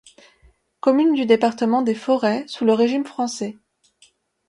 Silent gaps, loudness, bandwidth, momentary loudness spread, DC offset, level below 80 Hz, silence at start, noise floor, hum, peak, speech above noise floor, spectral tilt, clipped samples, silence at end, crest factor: none; -20 LUFS; 11 kHz; 9 LU; under 0.1%; -64 dBFS; 0.85 s; -58 dBFS; none; -2 dBFS; 39 dB; -5 dB/octave; under 0.1%; 0.95 s; 18 dB